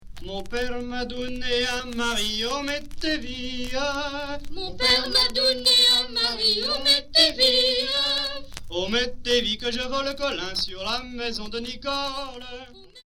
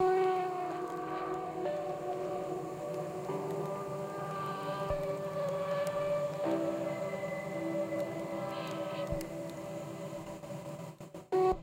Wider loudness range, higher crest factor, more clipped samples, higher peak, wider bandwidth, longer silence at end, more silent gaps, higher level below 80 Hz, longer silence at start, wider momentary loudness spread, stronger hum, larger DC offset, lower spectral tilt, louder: first, 9 LU vs 3 LU; about the same, 20 dB vs 16 dB; neither; first, -6 dBFS vs -20 dBFS; first, 19 kHz vs 16.5 kHz; about the same, 0.05 s vs 0 s; neither; first, -42 dBFS vs -58 dBFS; about the same, 0 s vs 0 s; first, 15 LU vs 9 LU; neither; neither; second, -2 dB/octave vs -6.5 dB/octave; first, -22 LUFS vs -37 LUFS